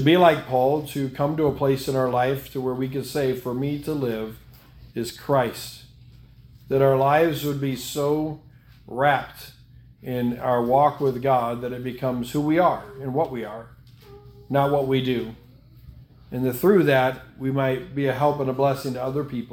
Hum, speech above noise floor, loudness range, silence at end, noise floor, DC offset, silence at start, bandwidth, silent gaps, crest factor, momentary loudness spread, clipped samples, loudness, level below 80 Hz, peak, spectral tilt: none; 27 dB; 5 LU; 0 s; -49 dBFS; under 0.1%; 0 s; 18 kHz; none; 20 dB; 13 LU; under 0.1%; -23 LUFS; -52 dBFS; -2 dBFS; -6.5 dB/octave